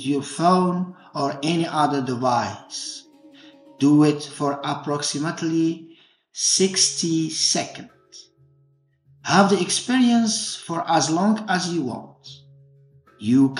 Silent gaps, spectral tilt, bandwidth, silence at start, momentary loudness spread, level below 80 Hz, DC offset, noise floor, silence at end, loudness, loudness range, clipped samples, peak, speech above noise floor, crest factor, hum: none; -4 dB/octave; 11.5 kHz; 0 s; 13 LU; -76 dBFS; under 0.1%; -61 dBFS; 0 s; -21 LUFS; 3 LU; under 0.1%; -2 dBFS; 40 dB; 22 dB; none